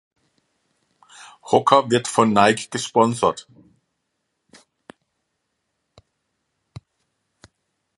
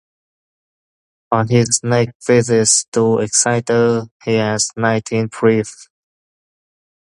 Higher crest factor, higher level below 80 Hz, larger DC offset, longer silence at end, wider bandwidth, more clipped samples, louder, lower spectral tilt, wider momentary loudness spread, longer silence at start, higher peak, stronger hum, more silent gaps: first, 24 dB vs 18 dB; second, -62 dBFS vs -54 dBFS; neither; first, 4.55 s vs 1.35 s; about the same, 11.5 kHz vs 11.5 kHz; neither; second, -18 LUFS vs -15 LUFS; about the same, -4.5 dB/octave vs -4 dB/octave; about the same, 8 LU vs 7 LU; first, 1.45 s vs 1.3 s; about the same, 0 dBFS vs 0 dBFS; neither; second, none vs 2.15-2.20 s, 2.88-2.92 s, 4.11-4.20 s